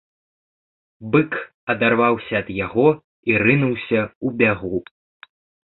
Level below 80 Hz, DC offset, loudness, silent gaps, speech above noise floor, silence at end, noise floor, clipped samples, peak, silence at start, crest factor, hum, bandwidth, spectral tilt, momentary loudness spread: -52 dBFS; under 0.1%; -20 LUFS; 1.54-1.67 s, 3.04-3.23 s, 4.15-4.21 s; over 71 dB; 0.85 s; under -90 dBFS; under 0.1%; -2 dBFS; 1 s; 20 dB; none; 4.2 kHz; -11.5 dB/octave; 9 LU